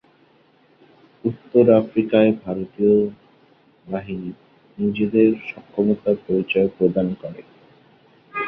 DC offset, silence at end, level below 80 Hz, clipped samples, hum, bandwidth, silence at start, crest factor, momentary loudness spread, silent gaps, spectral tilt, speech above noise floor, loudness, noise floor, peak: under 0.1%; 0 s; -56 dBFS; under 0.1%; none; 4.6 kHz; 1.25 s; 20 dB; 14 LU; none; -10.5 dB/octave; 37 dB; -20 LUFS; -56 dBFS; -2 dBFS